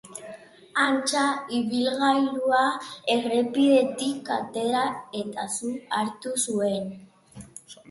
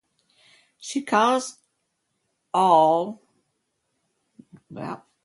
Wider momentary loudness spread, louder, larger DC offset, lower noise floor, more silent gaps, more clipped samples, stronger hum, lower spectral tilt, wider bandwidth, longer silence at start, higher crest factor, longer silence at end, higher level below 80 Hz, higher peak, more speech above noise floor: second, 15 LU vs 20 LU; second, -25 LUFS vs -21 LUFS; neither; second, -46 dBFS vs -76 dBFS; neither; neither; neither; about the same, -3 dB/octave vs -4 dB/octave; about the same, 12 kHz vs 11.5 kHz; second, 0.05 s vs 0.8 s; about the same, 18 dB vs 20 dB; second, 0.15 s vs 0.3 s; first, -68 dBFS vs -78 dBFS; second, -8 dBFS vs -4 dBFS; second, 21 dB vs 54 dB